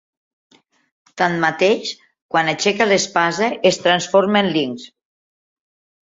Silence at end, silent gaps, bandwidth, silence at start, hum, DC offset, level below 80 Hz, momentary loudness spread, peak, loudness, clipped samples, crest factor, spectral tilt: 1.15 s; 2.22-2.29 s; 7.8 kHz; 1.15 s; none; under 0.1%; -62 dBFS; 8 LU; -2 dBFS; -17 LUFS; under 0.1%; 18 dB; -3.5 dB/octave